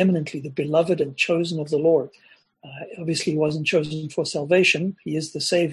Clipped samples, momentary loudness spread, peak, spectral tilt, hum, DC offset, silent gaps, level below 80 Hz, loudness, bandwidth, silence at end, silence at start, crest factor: under 0.1%; 11 LU; -6 dBFS; -5 dB/octave; none; under 0.1%; none; -66 dBFS; -22 LUFS; 12 kHz; 0 s; 0 s; 18 dB